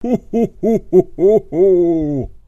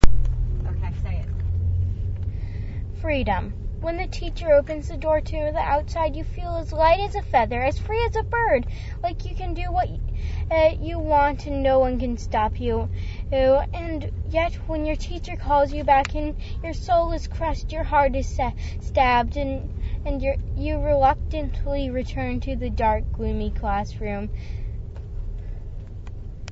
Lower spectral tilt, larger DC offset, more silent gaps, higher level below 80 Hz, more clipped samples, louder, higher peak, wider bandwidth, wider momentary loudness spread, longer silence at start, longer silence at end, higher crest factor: first, -10 dB/octave vs -7 dB/octave; neither; neither; second, -38 dBFS vs -28 dBFS; neither; first, -15 LUFS vs -24 LUFS; about the same, 0 dBFS vs 0 dBFS; about the same, 7.4 kHz vs 7.8 kHz; second, 6 LU vs 12 LU; about the same, 0 s vs 0 s; about the same, 0.1 s vs 0 s; second, 14 dB vs 22 dB